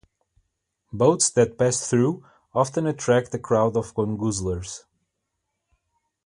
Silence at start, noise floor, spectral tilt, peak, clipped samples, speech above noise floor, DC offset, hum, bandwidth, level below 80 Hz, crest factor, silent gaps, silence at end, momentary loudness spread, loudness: 0.95 s; -79 dBFS; -5 dB/octave; -6 dBFS; under 0.1%; 57 dB; under 0.1%; none; 11.5 kHz; -50 dBFS; 20 dB; none; 1.45 s; 12 LU; -23 LUFS